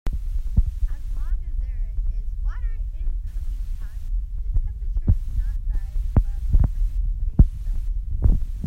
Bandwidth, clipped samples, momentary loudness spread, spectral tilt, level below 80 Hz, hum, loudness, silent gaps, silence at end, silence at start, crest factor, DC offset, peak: 2.1 kHz; under 0.1%; 10 LU; -9.5 dB/octave; -22 dBFS; none; -27 LUFS; none; 0 s; 0.05 s; 20 dB; under 0.1%; -2 dBFS